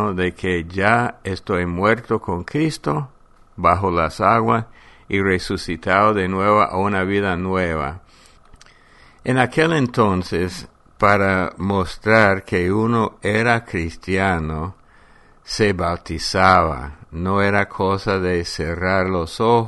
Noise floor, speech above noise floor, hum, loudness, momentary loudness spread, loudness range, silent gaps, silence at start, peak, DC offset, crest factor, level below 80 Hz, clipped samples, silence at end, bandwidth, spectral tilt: -49 dBFS; 30 dB; none; -19 LUFS; 10 LU; 3 LU; none; 0 s; 0 dBFS; under 0.1%; 20 dB; -40 dBFS; under 0.1%; 0 s; 11.5 kHz; -6 dB/octave